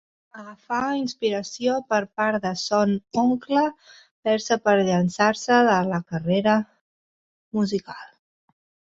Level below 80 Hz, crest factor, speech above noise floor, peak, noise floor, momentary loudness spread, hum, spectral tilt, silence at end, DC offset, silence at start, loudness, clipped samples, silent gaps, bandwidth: -64 dBFS; 20 dB; over 68 dB; -4 dBFS; under -90 dBFS; 11 LU; none; -5.5 dB/octave; 0.9 s; under 0.1%; 0.35 s; -23 LUFS; under 0.1%; 4.11-4.23 s, 6.81-7.51 s; 8 kHz